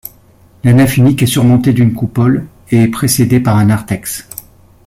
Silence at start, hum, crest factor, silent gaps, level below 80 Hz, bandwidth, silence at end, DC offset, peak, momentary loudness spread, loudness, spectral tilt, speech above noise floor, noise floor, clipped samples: 0.65 s; none; 12 dB; none; -40 dBFS; 16 kHz; 0.45 s; under 0.1%; 0 dBFS; 12 LU; -11 LUFS; -6 dB/octave; 35 dB; -44 dBFS; under 0.1%